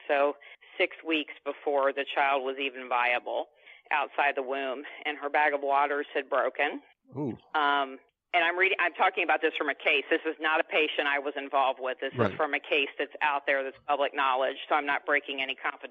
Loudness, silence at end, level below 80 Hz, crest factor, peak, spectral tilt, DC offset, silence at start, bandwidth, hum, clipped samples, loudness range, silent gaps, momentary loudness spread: -28 LUFS; 0.05 s; -82 dBFS; 20 dB; -10 dBFS; -1 dB/octave; under 0.1%; 0.05 s; 5.6 kHz; none; under 0.1%; 3 LU; none; 9 LU